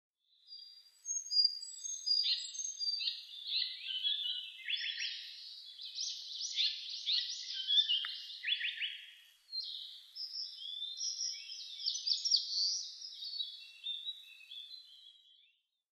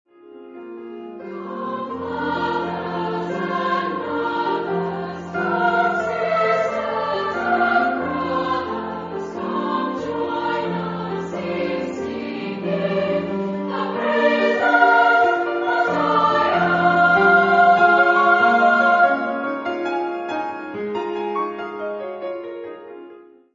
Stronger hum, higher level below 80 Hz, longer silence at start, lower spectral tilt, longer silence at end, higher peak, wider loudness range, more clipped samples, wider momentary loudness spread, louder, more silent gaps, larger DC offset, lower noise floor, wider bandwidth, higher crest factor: neither; second, under -90 dBFS vs -60 dBFS; first, 0.45 s vs 0.25 s; second, 10.5 dB/octave vs -6.5 dB/octave; first, 0.6 s vs 0.35 s; second, -16 dBFS vs -2 dBFS; second, 6 LU vs 10 LU; neither; first, 18 LU vs 15 LU; second, -35 LUFS vs -20 LUFS; neither; neither; first, -74 dBFS vs -44 dBFS; first, 13 kHz vs 7.6 kHz; about the same, 22 dB vs 18 dB